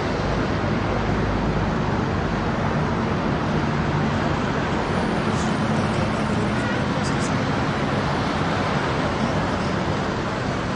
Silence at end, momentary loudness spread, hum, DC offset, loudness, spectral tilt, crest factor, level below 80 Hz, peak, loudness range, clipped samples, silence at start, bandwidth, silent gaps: 0 s; 1 LU; none; under 0.1%; -23 LUFS; -6 dB/octave; 14 dB; -36 dBFS; -8 dBFS; 0 LU; under 0.1%; 0 s; 10.5 kHz; none